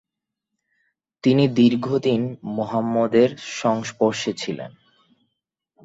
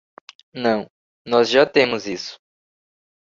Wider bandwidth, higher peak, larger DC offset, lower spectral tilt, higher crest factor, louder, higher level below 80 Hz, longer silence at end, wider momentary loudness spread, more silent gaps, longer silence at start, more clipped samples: about the same, 8 kHz vs 7.6 kHz; about the same, -4 dBFS vs -2 dBFS; neither; first, -6 dB/octave vs -4 dB/octave; about the same, 18 dB vs 20 dB; about the same, -21 LUFS vs -19 LUFS; about the same, -64 dBFS vs -62 dBFS; first, 1.15 s vs 0.9 s; second, 11 LU vs 19 LU; second, none vs 0.90-1.25 s; first, 1.25 s vs 0.55 s; neither